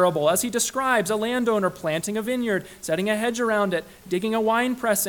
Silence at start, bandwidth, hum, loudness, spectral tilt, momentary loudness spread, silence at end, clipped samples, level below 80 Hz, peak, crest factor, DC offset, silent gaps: 0 s; 19 kHz; none; -23 LUFS; -3.5 dB/octave; 6 LU; 0 s; under 0.1%; -58 dBFS; -6 dBFS; 16 dB; under 0.1%; none